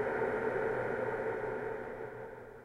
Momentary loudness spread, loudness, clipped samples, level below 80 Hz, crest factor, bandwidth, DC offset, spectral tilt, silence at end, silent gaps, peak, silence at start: 11 LU; -36 LUFS; under 0.1%; -60 dBFS; 14 dB; 11.5 kHz; under 0.1%; -7.5 dB/octave; 0 s; none; -22 dBFS; 0 s